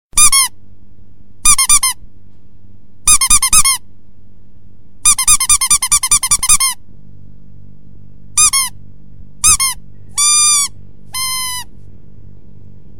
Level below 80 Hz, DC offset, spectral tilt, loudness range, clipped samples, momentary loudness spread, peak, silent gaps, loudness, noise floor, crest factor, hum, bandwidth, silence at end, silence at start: -32 dBFS; 4%; 2 dB/octave; 4 LU; under 0.1%; 13 LU; 0 dBFS; none; -10 LUFS; -45 dBFS; 14 dB; none; 17 kHz; 1.35 s; 0.05 s